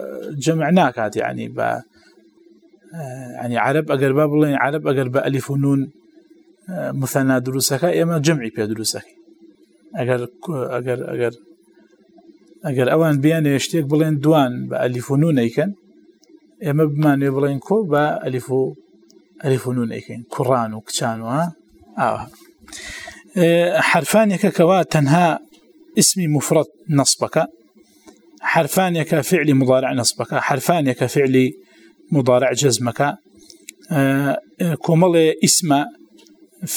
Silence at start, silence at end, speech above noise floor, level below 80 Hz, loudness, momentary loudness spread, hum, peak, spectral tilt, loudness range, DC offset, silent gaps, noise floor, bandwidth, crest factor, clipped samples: 0 s; 0 s; 35 dB; -62 dBFS; -18 LUFS; 12 LU; none; 0 dBFS; -5 dB/octave; 6 LU; under 0.1%; none; -53 dBFS; 19.5 kHz; 18 dB; under 0.1%